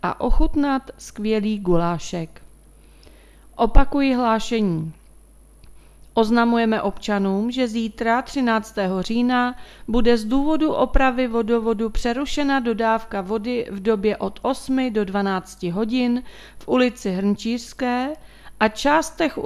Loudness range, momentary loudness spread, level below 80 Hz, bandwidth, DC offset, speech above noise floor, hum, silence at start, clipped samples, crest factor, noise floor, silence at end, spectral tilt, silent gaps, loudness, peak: 3 LU; 7 LU; -30 dBFS; 13 kHz; under 0.1%; 28 dB; none; 0.05 s; under 0.1%; 20 dB; -48 dBFS; 0 s; -5.5 dB/octave; none; -22 LUFS; 0 dBFS